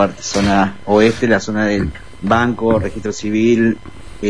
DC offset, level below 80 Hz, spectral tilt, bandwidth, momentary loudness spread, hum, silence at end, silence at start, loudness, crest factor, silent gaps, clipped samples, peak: 2%; -36 dBFS; -5.5 dB/octave; 10.5 kHz; 10 LU; none; 0 s; 0 s; -16 LUFS; 14 dB; none; under 0.1%; 0 dBFS